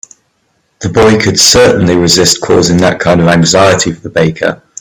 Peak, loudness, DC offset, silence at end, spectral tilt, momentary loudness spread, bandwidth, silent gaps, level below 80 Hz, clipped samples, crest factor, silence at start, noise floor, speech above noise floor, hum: 0 dBFS; -7 LUFS; under 0.1%; 0.25 s; -4 dB/octave; 8 LU; over 20 kHz; none; -36 dBFS; 0.4%; 8 dB; 0.8 s; -58 dBFS; 50 dB; none